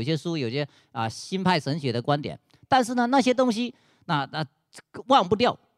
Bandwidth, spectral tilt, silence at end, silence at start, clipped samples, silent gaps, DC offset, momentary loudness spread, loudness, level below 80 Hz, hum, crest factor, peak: 13 kHz; -5.5 dB/octave; 0.2 s; 0 s; under 0.1%; none; under 0.1%; 13 LU; -25 LUFS; -64 dBFS; none; 18 dB; -6 dBFS